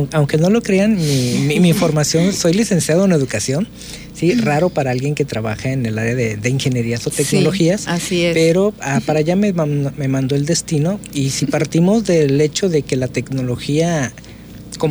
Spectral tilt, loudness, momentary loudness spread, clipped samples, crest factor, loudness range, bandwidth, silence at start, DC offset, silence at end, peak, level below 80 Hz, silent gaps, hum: -5.5 dB/octave; -16 LUFS; 7 LU; under 0.1%; 12 dB; 3 LU; over 20 kHz; 0 s; under 0.1%; 0 s; -4 dBFS; -44 dBFS; none; none